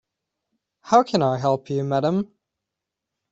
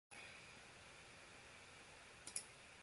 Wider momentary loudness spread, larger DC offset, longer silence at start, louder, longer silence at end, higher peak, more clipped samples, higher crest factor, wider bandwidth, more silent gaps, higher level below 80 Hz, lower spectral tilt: second, 7 LU vs 10 LU; neither; first, 0.85 s vs 0.1 s; first, -21 LUFS vs -56 LUFS; first, 1.05 s vs 0 s; first, -2 dBFS vs -24 dBFS; neither; second, 22 dB vs 34 dB; second, 8 kHz vs 11.5 kHz; neither; first, -64 dBFS vs -78 dBFS; first, -6.5 dB/octave vs -1 dB/octave